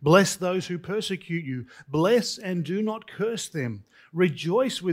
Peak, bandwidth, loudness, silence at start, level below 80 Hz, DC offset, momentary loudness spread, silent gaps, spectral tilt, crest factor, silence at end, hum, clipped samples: -4 dBFS; 16 kHz; -26 LUFS; 0 s; -64 dBFS; under 0.1%; 11 LU; none; -5 dB/octave; 20 dB; 0 s; none; under 0.1%